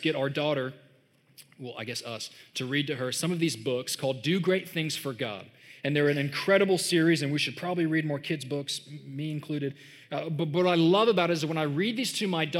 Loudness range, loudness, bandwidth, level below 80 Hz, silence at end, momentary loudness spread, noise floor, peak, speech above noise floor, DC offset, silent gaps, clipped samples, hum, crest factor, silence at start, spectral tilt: 5 LU; -28 LUFS; 16 kHz; -86 dBFS; 0 s; 13 LU; -63 dBFS; -10 dBFS; 35 dB; under 0.1%; none; under 0.1%; none; 18 dB; 0 s; -5 dB/octave